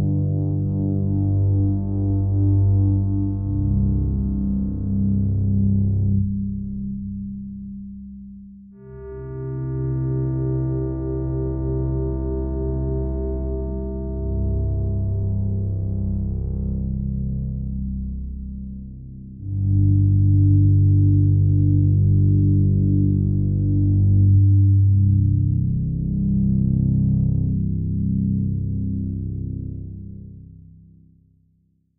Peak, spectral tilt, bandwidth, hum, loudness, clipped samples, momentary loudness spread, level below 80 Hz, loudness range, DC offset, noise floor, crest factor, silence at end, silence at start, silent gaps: -8 dBFS; -15.5 dB/octave; 1.5 kHz; none; -21 LUFS; under 0.1%; 16 LU; -30 dBFS; 10 LU; under 0.1%; -63 dBFS; 12 dB; 1.4 s; 0 s; none